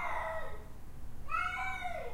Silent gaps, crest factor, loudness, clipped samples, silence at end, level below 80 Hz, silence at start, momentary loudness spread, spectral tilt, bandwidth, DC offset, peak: none; 14 dB; -38 LUFS; under 0.1%; 0 s; -48 dBFS; 0 s; 17 LU; -4 dB/octave; 15.5 kHz; under 0.1%; -24 dBFS